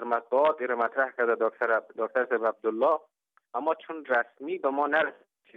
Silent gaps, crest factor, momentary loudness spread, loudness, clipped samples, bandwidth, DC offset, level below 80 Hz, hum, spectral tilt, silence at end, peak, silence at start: none; 16 dB; 6 LU; -28 LUFS; under 0.1%; 5.4 kHz; under 0.1%; -88 dBFS; none; -6 dB/octave; 0.45 s; -12 dBFS; 0 s